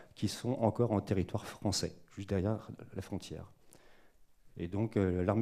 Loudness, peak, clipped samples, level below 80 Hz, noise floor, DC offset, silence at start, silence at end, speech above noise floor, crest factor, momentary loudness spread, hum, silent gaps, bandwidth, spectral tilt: -35 LUFS; -14 dBFS; under 0.1%; -64 dBFS; -61 dBFS; under 0.1%; 0 s; 0 s; 27 dB; 20 dB; 15 LU; none; none; 14.5 kHz; -6 dB/octave